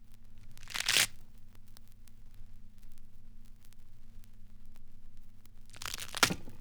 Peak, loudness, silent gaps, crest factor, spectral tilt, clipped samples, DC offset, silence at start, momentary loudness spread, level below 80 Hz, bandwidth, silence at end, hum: -8 dBFS; -31 LUFS; none; 30 dB; -1 dB/octave; under 0.1%; under 0.1%; 0 s; 21 LU; -50 dBFS; over 20 kHz; 0 s; none